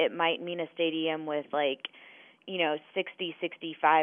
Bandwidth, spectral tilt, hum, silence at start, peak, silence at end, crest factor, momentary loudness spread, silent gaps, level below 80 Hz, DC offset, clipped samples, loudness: 3.7 kHz; -7.5 dB/octave; none; 0 s; -10 dBFS; 0 s; 20 dB; 10 LU; none; under -90 dBFS; under 0.1%; under 0.1%; -31 LUFS